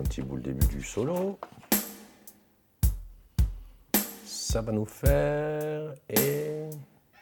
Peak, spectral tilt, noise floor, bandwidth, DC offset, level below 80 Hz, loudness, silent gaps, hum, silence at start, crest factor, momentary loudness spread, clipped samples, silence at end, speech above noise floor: -8 dBFS; -5 dB/octave; -63 dBFS; 19 kHz; under 0.1%; -36 dBFS; -29 LUFS; none; none; 0 s; 22 dB; 15 LU; under 0.1%; 0.4 s; 34 dB